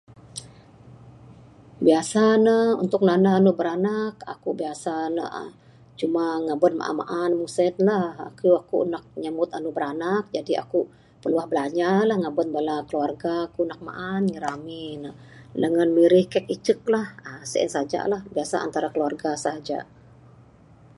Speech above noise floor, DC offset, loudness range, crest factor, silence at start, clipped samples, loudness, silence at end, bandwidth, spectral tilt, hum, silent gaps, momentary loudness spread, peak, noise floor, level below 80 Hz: 29 dB; under 0.1%; 6 LU; 20 dB; 0.25 s; under 0.1%; -24 LUFS; 1.15 s; 11.5 kHz; -6 dB/octave; none; none; 15 LU; -4 dBFS; -51 dBFS; -64 dBFS